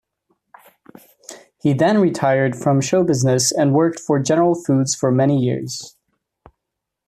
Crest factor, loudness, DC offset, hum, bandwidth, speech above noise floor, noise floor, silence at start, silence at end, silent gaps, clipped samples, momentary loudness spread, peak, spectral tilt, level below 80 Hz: 16 dB; -17 LUFS; under 0.1%; none; 14 kHz; 64 dB; -81 dBFS; 1.3 s; 1.2 s; none; under 0.1%; 14 LU; -4 dBFS; -5.5 dB/octave; -60 dBFS